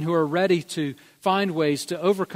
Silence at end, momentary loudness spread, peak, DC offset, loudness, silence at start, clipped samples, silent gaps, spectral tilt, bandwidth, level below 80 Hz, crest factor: 0 s; 8 LU; -8 dBFS; under 0.1%; -24 LUFS; 0 s; under 0.1%; none; -5.5 dB/octave; 16 kHz; -70 dBFS; 16 dB